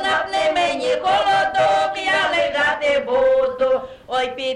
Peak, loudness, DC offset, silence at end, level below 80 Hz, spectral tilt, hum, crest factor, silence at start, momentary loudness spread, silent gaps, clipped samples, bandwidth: -8 dBFS; -18 LUFS; under 0.1%; 0 s; -50 dBFS; -2.5 dB/octave; none; 10 dB; 0 s; 5 LU; none; under 0.1%; 11 kHz